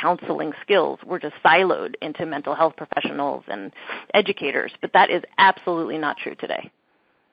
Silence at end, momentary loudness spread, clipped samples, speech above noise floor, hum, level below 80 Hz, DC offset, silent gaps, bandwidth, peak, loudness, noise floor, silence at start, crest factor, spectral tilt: 0.65 s; 13 LU; under 0.1%; 43 dB; none; -70 dBFS; under 0.1%; none; 5.2 kHz; -2 dBFS; -21 LUFS; -65 dBFS; 0 s; 20 dB; -7.5 dB/octave